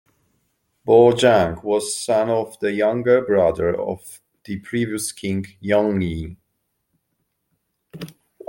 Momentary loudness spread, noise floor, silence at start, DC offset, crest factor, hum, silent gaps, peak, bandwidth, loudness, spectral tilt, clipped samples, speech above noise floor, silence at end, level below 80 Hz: 19 LU; -73 dBFS; 0.85 s; under 0.1%; 20 dB; none; none; -2 dBFS; 17 kHz; -19 LUFS; -5 dB/octave; under 0.1%; 54 dB; 0.4 s; -52 dBFS